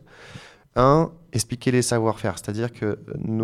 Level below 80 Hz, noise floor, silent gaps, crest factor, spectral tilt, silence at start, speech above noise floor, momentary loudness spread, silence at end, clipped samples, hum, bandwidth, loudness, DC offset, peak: -46 dBFS; -45 dBFS; none; 18 dB; -5.5 dB/octave; 0.2 s; 23 dB; 14 LU; 0 s; under 0.1%; none; 15 kHz; -23 LUFS; under 0.1%; -4 dBFS